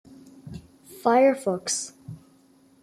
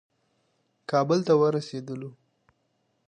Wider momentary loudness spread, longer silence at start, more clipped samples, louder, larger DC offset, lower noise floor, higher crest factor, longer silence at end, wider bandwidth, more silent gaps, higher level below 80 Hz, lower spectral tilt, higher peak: first, 25 LU vs 19 LU; second, 0.45 s vs 0.9 s; neither; about the same, -23 LUFS vs -25 LUFS; neither; second, -58 dBFS vs -73 dBFS; about the same, 20 dB vs 18 dB; second, 0.65 s vs 1 s; first, 15 kHz vs 9.6 kHz; neither; first, -64 dBFS vs -78 dBFS; second, -3.5 dB/octave vs -7 dB/octave; about the same, -8 dBFS vs -10 dBFS